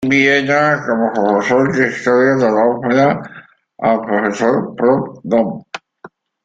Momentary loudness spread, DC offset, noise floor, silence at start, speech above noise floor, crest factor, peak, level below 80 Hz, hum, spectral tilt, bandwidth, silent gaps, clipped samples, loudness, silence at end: 9 LU; under 0.1%; -42 dBFS; 0 s; 28 dB; 14 dB; -2 dBFS; -56 dBFS; none; -6 dB/octave; 7.8 kHz; none; under 0.1%; -14 LUFS; 0.4 s